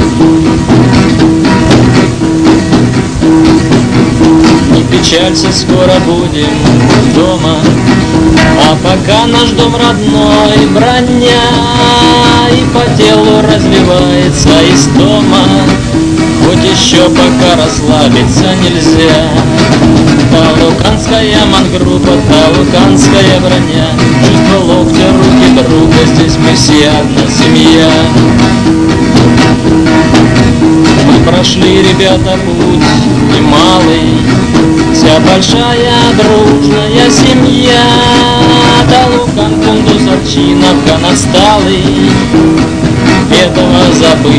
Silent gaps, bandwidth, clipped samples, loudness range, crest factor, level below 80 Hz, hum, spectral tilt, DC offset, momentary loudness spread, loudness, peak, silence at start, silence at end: none; 11 kHz; 10%; 1 LU; 6 dB; -22 dBFS; none; -5 dB/octave; 2%; 3 LU; -5 LUFS; 0 dBFS; 0 s; 0 s